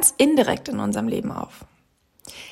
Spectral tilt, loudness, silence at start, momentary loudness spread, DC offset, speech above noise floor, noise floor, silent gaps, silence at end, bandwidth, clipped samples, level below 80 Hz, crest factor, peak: -3.5 dB/octave; -21 LUFS; 0 s; 21 LU; under 0.1%; 40 dB; -62 dBFS; none; 0 s; 16.5 kHz; under 0.1%; -56 dBFS; 20 dB; -2 dBFS